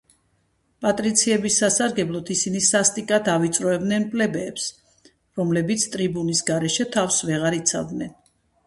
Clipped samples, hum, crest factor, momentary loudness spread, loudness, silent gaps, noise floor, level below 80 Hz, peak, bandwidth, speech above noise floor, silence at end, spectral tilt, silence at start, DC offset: under 0.1%; none; 20 dB; 9 LU; -21 LUFS; none; -67 dBFS; -60 dBFS; -2 dBFS; 12 kHz; 45 dB; 0.55 s; -3.5 dB/octave; 0.8 s; under 0.1%